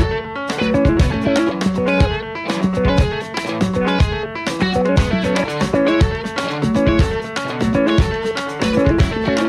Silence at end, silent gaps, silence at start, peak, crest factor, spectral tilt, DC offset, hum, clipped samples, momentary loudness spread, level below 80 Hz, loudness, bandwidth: 0 s; none; 0 s; -4 dBFS; 14 dB; -6.5 dB/octave; under 0.1%; none; under 0.1%; 7 LU; -26 dBFS; -18 LUFS; 12.5 kHz